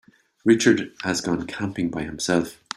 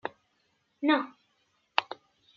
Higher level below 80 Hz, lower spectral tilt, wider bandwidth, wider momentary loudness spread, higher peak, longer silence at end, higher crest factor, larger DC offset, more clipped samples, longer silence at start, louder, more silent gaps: first, -54 dBFS vs -86 dBFS; first, -4.5 dB/octave vs 0.5 dB/octave; first, 15 kHz vs 6.4 kHz; second, 10 LU vs 18 LU; about the same, -4 dBFS vs -4 dBFS; second, 0.25 s vs 0.45 s; second, 20 dB vs 30 dB; neither; neither; first, 0.45 s vs 0.05 s; first, -23 LUFS vs -30 LUFS; neither